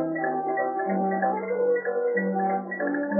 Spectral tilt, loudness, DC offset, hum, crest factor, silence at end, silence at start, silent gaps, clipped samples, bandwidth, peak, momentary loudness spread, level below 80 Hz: -14 dB/octave; -26 LUFS; under 0.1%; none; 14 dB; 0 s; 0 s; none; under 0.1%; 2.4 kHz; -12 dBFS; 3 LU; under -90 dBFS